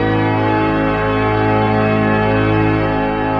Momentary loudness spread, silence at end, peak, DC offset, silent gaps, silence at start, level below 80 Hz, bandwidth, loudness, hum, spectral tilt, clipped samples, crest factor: 2 LU; 0 s; -4 dBFS; 0.3%; none; 0 s; -32 dBFS; 5.4 kHz; -15 LUFS; none; -9 dB/octave; under 0.1%; 12 dB